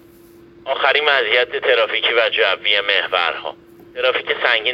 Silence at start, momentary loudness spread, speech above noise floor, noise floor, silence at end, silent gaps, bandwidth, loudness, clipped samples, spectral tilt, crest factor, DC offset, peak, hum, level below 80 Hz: 0.65 s; 11 LU; 28 dB; -45 dBFS; 0 s; none; 13.5 kHz; -16 LUFS; under 0.1%; -3 dB/octave; 18 dB; under 0.1%; 0 dBFS; none; -62 dBFS